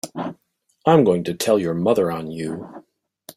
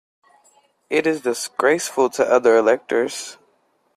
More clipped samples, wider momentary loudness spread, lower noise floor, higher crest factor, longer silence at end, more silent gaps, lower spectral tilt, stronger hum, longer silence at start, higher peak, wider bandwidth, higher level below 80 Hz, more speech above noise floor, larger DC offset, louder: neither; first, 16 LU vs 10 LU; about the same, -67 dBFS vs -64 dBFS; about the same, 18 dB vs 18 dB; second, 0.05 s vs 0.65 s; neither; first, -6 dB/octave vs -3 dB/octave; neither; second, 0.05 s vs 0.9 s; about the same, -2 dBFS vs -2 dBFS; first, 16 kHz vs 14 kHz; first, -60 dBFS vs -66 dBFS; about the same, 48 dB vs 45 dB; neither; about the same, -20 LUFS vs -19 LUFS